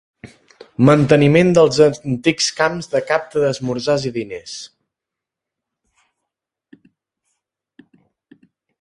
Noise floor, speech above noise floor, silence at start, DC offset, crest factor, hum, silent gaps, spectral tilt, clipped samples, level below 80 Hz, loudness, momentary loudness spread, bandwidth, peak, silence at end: -84 dBFS; 69 dB; 0.25 s; under 0.1%; 18 dB; none; none; -5.5 dB/octave; under 0.1%; -54 dBFS; -16 LUFS; 18 LU; 11.5 kHz; 0 dBFS; 4.15 s